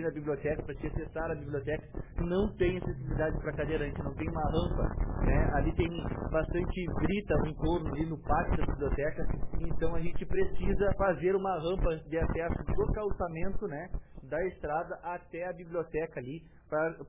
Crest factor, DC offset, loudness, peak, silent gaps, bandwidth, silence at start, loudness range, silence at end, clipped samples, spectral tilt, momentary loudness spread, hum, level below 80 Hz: 14 dB; under 0.1%; -34 LUFS; -16 dBFS; none; 3.8 kHz; 0 s; 4 LU; 0 s; under 0.1%; -11 dB/octave; 9 LU; none; -38 dBFS